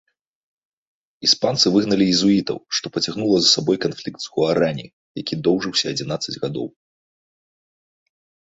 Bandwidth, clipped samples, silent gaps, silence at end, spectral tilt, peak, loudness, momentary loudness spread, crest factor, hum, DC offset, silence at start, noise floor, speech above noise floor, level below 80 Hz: 8 kHz; under 0.1%; 4.93-5.15 s; 1.8 s; -4 dB/octave; -2 dBFS; -19 LUFS; 13 LU; 20 dB; none; under 0.1%; 1.2 s; under -90 dBFS; over 70 dB; -58 dBFS